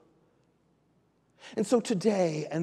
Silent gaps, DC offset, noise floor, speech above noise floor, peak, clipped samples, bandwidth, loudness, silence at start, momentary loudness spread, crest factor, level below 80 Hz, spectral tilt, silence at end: none; under 0.1%; -69 dBFS; 41 dB; -12 dBFS; under 0.1%; 13 kHz; -28 LUFS; 1.45 s; 8 LU; 18 dB; -78 dBFS; -6 dB/octave; 0 s